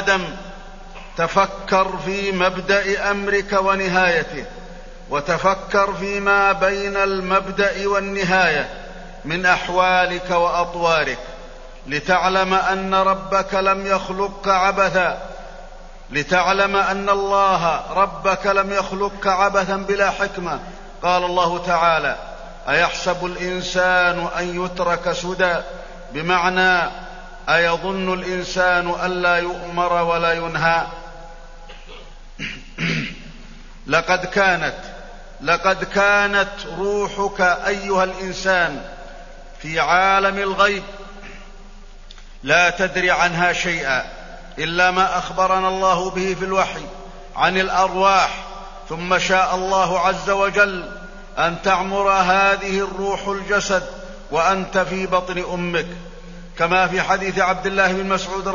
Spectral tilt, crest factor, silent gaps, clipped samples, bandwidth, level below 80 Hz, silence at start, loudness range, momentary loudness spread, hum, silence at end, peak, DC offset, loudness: -4 dB/octave; 18 dB; none; under 0.1%; 7.4 kHz; -38 dBFS; 0 s; 3 LU; 18 LU; none; 0 s; -2 dBFS; under 0.1%; -19 LUFS